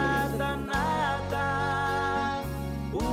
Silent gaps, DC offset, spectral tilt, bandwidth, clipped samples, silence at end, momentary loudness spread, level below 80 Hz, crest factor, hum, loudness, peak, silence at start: none; under 0.1%; -5.5 dB/octave; 16 kHz; under 0.1%; 0 s; 6 LU; -42 dBFS; 10 dB; none; -29 LUFS; -18 dBFS; 0 s